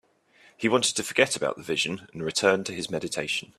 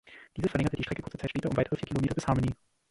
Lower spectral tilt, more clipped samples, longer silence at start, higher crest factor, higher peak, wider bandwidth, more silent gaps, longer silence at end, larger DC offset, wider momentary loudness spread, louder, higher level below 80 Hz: second, -2.5 dB/octave vs -7 dB/octave; neither; first, 0.6 s vs 0.05 s; first, 24 dB vs 18 dB; first, -4 dBFS vs -12 dBFS; first, 14.5 kHz vs 11.5 kHz; neither; second, 0.15 s vs 0.35 s; neither; about the same, 7 LU vs 7 LU; first, -26 LUFS vs -31 LUFS; second, -64 dBFS vs -48 dBFS